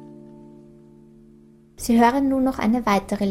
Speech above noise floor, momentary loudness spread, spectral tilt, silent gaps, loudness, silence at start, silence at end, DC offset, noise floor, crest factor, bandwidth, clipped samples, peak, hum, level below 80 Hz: 31 dB; 5 LU; -5.5 dB/octave; none; -20 LUFS; 0 s; 0 s; under 0.1%; -51 dBFS; 16 dB; 16 kHz; under 0.1%; -6 dBFS; none; -48 dBFS